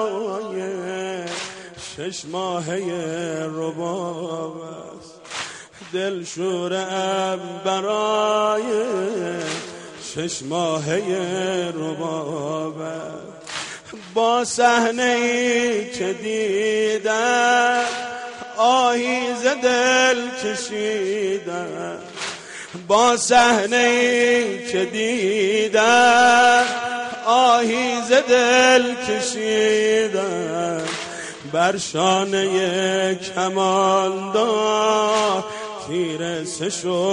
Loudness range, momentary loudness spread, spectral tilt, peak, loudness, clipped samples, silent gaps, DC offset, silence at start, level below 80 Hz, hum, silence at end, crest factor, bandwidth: 11 LU; 15 LU; -3 dB/octave; -4 dBFS; -20 LUFS; under 0.1%; none; under 0.1%; 0 s; -62 dBFS; none; 0 s; 16 dB; 10.5 kHz